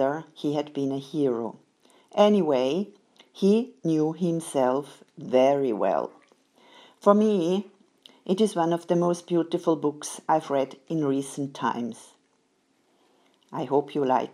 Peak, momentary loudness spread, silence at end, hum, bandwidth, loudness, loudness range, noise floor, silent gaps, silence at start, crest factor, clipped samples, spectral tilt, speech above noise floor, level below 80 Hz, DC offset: -4 dBFS; 13 LU; 0.05 s; none; 13 kHz; -25 LUFS; 5 LU; -68 dBFS; none; 0 s; 22 dB; under 0.1%; -6.5 dB/octave; 44 dB; -82 dBFS; under 0.1%